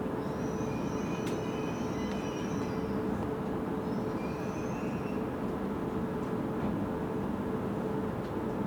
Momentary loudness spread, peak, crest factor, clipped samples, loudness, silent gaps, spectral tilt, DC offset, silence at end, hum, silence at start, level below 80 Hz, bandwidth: 2 LU; -22 dBFS; 12 dB; under 0.1%; -34 LUFS; none; -7 dB/octave; under 0.1%; 0 s; none; 0 s; -52 dBFS; over 20 kHz